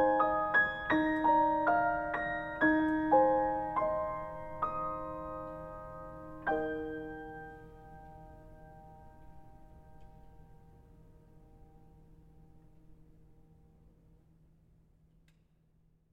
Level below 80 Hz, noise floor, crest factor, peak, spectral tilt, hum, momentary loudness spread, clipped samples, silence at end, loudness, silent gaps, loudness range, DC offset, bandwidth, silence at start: -58 dBFS; -69 dBFS; 20 dB; -14 dBFS; -7.5 dB/octave; none; 25 LU; under 0.1%; 3.2 s; -32 LUFS; none; 20 LU; under 0.1%; 5.4 kHz; 0 s